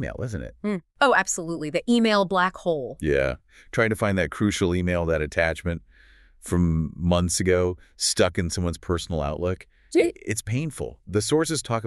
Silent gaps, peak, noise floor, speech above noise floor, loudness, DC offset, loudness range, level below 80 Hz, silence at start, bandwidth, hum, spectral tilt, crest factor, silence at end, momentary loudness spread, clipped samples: none; -6 dBFS; -53 dBFS; 29 dB; -24 LUFS; under 0.1%; 2 LU; -42 dBFS; 0 s; 13.5 kHz; none; -4.5 dB/octave; 20 dB; 0 s; 10 LU; under 0.1%